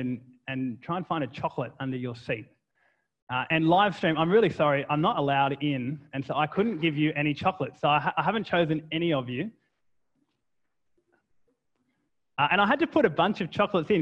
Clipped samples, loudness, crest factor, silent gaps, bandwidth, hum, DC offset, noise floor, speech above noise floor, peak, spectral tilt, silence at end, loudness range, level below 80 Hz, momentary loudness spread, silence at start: under 0.1%; -27 LUFS; 20 dB; 3.22-3.27 s; 8.2 kHz; none; under 0.1%; -82 dBFS; 56 dB; -8 dBFS; -7.5 dB/octave; 0 s; 9 LU; -64 dBFS; 11 LU; 0 s